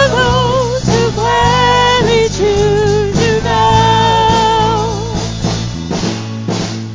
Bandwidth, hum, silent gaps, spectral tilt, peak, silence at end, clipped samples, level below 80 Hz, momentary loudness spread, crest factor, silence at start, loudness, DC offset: 7.6 kHz; none; none; -5 dB/octave; 0 dBFS; 0 s; under 0.1%; -26 dBFS; 9 LU; 12 dB; 0 s; -12 LUFS; under 0.1%